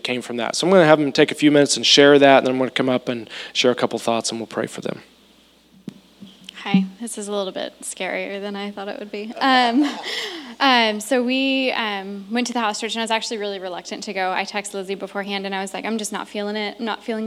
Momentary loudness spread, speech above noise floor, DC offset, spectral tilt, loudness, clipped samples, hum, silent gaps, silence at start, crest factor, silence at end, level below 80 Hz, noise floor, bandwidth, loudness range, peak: 16 LU; 34 dB; under 0.1%; -3.5 dB/octave; -20 LUFS; under 0.1%; none; none; 0.05 s; 20 dB; 0 s; -70 dBFS; -54 dBFS; 14.5 kHz; 11 LU; 0 dBFS